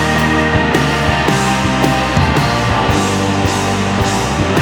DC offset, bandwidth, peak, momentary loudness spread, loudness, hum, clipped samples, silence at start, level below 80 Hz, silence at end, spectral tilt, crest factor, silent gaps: under 0.1%; over 20 kHz; 0 dBFS; 2 LU; -14 LUFS; none; under 0.1%; 0 s; -28 dBFS; 0 s; -5 dB/octave; 14 dB; none